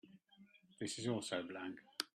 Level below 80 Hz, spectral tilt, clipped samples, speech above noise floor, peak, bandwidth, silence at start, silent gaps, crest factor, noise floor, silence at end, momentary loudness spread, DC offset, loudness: -86 dBFS; -4 dB/octave; under 0.1%; 24 dB; -18 dBFS; 14 kHz; 0.05 s; none; 28 dB; -67 dBFS; 0.1 s; 8 LU; under 0.1%; -44 LUFS